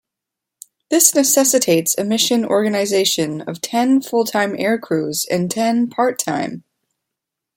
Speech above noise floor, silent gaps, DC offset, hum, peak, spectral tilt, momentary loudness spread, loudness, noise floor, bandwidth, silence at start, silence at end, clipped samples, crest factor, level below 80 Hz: 66 dB; none; under 0.1%; none; 0 dBFS; -3 dB/octave; 9 LU; -17 LUFS; -83 dBFS; 16.5 kHz; 0.9 s; 1 s; under 0.1%; 18 dB; -64 dBFS